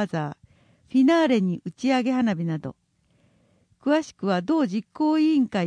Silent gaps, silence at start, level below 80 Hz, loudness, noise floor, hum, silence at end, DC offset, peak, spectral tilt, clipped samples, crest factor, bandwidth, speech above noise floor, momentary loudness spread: none; 0 s; -68 dBFS; -23 LUFS; -64 dBFS; none; 0 s; under 0.1%; -10 dBFS; -6.5 dB/octave; under 0.1%; 14 dB; 10 kHz; 42 dB; 11 LU